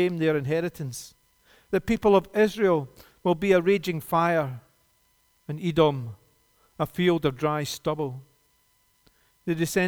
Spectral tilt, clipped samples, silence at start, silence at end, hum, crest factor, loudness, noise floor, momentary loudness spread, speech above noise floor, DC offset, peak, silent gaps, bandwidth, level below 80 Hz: -6 dB/octave; under 0.1%; 0 s; 0 s; none; 20 dB; -25 LUFS; -66 dBFS; 17 LU; 42 dB; under 0.1%; -8 dBFS; none; over 20 kHz; -54 dBFS